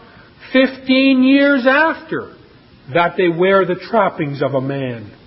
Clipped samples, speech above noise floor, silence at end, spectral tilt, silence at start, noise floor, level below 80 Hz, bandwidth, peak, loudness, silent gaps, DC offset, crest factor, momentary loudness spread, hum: under 0.1%; 30 dB; 0.15 s; -11 dB/octave; 0.4 s; -45 dBFS; -56 dBFS; 5.8 kHz; -2 dBFS; -15 LUFS; none; under 0.1%; 14 dB; 12 LU; none